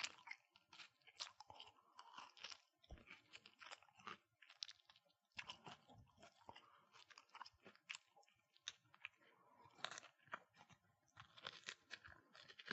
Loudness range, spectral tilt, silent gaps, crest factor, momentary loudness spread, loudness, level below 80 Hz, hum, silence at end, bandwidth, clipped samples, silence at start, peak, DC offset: 3 LU; 0.5 dB/octave; none; 36 dB; 12 LU; -59 LUFS; -82 dBFS; none; 0 s; 8 kHz; under 0.1%; 0 s; -24 dBFS; under 0.1%